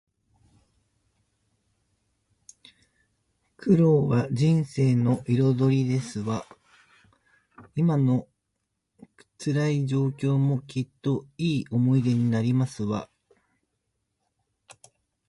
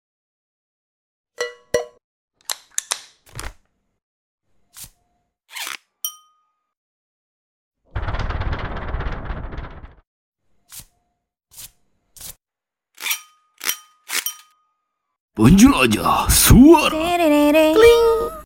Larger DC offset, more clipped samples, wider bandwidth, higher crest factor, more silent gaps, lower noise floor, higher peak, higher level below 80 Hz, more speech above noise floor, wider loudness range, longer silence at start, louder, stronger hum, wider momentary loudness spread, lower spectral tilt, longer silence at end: neither; neither; second, 11.5 kHz vs 17 kHz; about the same, 18 dB vs 20 dB; second, none vs 2.04-2.28 s, 4.03-4.38 s, 6.77-7.71 s, 10.07-10.32 s, 15.20-15.28 s; second, -80 dBFS vs -88 dBFS; second, -10 dBFS vs 0 dBFS; second, -62 dBFS vs -32 dBFS; second, 56 dB vs 76 dB; second, 6 LU vs 21 LU; first, 3.6 s vs 1.4 s; second, -25 LUFS vs -16 LUFS; neither; second, 9 LU vs 25 LU; first, -8 dB/octave vs -4.5 dB/octave; first, 2.25 s vs 0.05 s